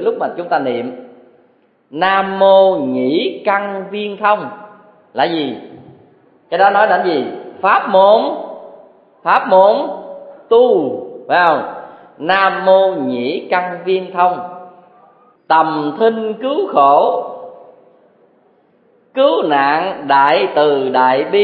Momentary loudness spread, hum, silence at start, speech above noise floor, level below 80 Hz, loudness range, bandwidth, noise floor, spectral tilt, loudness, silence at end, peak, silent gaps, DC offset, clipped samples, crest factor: 16 LU; none; 0 s; 41 dB; -66 dBFS; 4 LU; 5 kHz; -54 dBFS; -8 dB/octave; -14 LUFS; 0 s; 0 dBFS; none; under 0.1%; under 0.1%; 14 dB